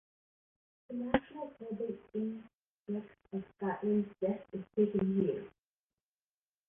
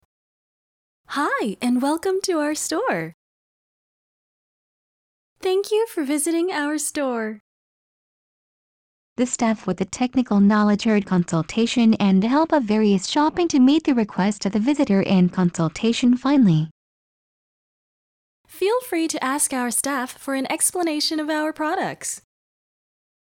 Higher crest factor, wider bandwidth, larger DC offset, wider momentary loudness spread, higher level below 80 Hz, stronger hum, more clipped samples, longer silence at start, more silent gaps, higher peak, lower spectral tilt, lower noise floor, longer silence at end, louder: first, 24 dB vs 14 dB; second, 3.7 kHz vs 17 kHz; neither; first, 13 LU vs 9 LU; about the same, -64 dBFS vs -60 dBFS; neither; neither; second, 0.9 s vs 1.1 s; second, 2.55-2.86 s vs 3.14-5.36 s, 7.40-9.16 s, 16.71-18.44 s; second, -14 dBFS vs -8 dBFS; first, -10.5 dB/octave vs -5 dB/octave; about the same, under -90 dBFS vs under -90 dBFS; first, 1.2 s vs 1 s; second, -37 LUFS vs -21 LUFS